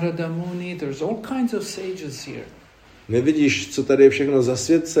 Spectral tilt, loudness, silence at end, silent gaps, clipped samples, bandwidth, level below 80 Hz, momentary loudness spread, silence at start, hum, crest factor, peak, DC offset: -5.5 dB/octave; -21 LUFS; 0 s; none; under 0.1%; 15 kHz; -58 dBFS; 17 LU; 0 s; none; 20 dB; -2 dBFS; under 0.1%